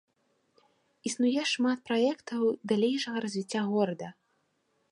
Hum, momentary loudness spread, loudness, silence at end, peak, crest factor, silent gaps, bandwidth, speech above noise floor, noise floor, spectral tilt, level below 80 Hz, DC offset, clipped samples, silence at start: none; 8 LU; -30 LUFS; 0.8 s; -14 dBFS; 18 dB; none; 11 kHz; 45 dB; -75 dBFS; -4.5 dB/octave; -80 dBFS; under 0.1%; under 0.1%; 1.05 s